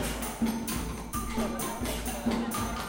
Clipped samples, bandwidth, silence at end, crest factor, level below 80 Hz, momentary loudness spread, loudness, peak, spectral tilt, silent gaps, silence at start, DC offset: under 0.1%; 17 kHz; 0 s; 14 dB; -42 dBFS; 4 LU; -32 LUFS; -18 dBFS; -4 dB/octave; none; 0 s; under 0.1%